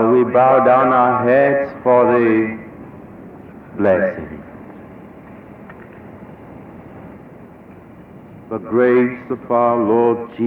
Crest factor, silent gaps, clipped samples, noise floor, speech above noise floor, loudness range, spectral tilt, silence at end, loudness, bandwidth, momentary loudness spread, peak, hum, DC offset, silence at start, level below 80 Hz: 16 dB; none; under 0.1%; -40 dBFS; 25 dB; 23 LU; -10 dB/octave; 0 s; -15 LUFS; 4.4 kHz; 25 LU; -2 dBFS; none; under 0.1%; 0 s; -54 dBFS